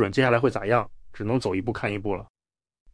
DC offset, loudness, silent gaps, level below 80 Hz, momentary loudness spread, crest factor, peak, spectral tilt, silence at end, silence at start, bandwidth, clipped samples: under 0.1%; -25 LUFS; none; -50 dBFS; 13 LU; 20 dB; -6 dBFS; -7 dB/octave; 0.7 s; 0 s; 10.5 kHz; under 0.1%